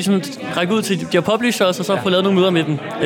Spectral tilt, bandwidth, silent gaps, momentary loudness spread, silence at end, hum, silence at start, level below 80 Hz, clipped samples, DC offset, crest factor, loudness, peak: -5 dB/octave; 18 kHz; none; 6 LU; 0 s; none; 0 s; -62 dBFS; under 0.1%; under 0.1%; 12 dB; -17 LUFS; -4 dBFS